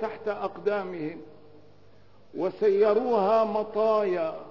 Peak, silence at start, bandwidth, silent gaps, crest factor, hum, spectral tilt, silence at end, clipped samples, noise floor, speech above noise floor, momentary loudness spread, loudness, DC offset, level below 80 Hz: -12 dBFS; 0 s; 6 kHz; none; 16 dB; 50 Hz at -60 dBFS; -7.5 dB/octave; 0 s; under 0.1%; -57 dBFS; 32 dB; 13 LU; -26 LUFS; 0.3%; -70 dBFS